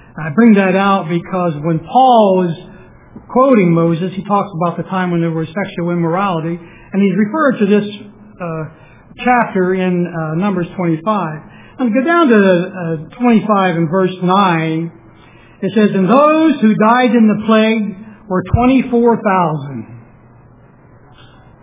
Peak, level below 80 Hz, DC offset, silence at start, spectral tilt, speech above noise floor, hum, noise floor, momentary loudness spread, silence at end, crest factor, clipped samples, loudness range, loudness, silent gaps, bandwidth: 0 dBFS; -42 dBFS; under 0.1%; 0.15 s; -11.5 dB/octave; 30 dB; none; -43 dBFS; 14 LU; 1.6 s; 14 dB; under 0.1%; 5 LU; -13 LUFS; none; 3.8 kHz